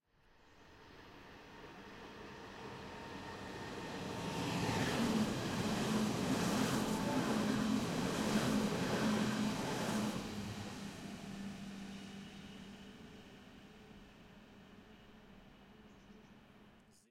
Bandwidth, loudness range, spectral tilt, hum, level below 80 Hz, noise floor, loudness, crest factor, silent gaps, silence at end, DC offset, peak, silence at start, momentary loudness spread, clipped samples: 16.5 kHz; 21 LU; -5 dB/octave; none; -62 dBFS; -68 dBFS; -38 LUFS; 18 dB; none; 0.3 s; under 0.1%; -24 dBFS; 0.5 s; 24 LU; under 0.1%